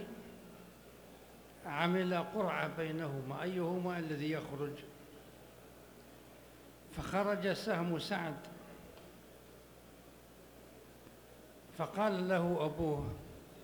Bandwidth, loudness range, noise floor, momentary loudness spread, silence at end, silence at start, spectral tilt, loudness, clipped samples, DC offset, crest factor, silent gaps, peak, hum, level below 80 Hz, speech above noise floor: over 20 kHz; 9 LU; -58 dBFS; 23 LU; 0 s; 0 s; -6.5 dB/octave; -37 LUFS; under 0.1%; under 0.1%; 22 dB; none; -18 dBFS; 60 Hz at -65 dBFS; -64 dBFS; 21 dB